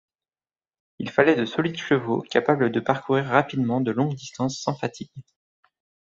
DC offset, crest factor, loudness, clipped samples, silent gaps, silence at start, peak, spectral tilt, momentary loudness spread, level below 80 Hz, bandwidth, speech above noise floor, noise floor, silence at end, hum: under 0.1%; 22 dB; -23 LUFS; under 0.1%; none; 1 s; -2 dBFS; -6 dB/octave; 10 LU; -64 dBFS; 7.8 kHz; over 67 dB; under -90 dBFS; 0.9 s; none